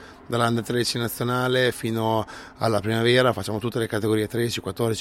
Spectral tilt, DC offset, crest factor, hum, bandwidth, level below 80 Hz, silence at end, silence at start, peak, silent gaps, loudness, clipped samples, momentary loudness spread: -5 dB/octave; under 0.1%; 18 dB; none; 16.5 kHz; -54 dBFS; 0 s; 0 s; -4 dBFS; none; -24 LUFS; under 0.1%; 7 LU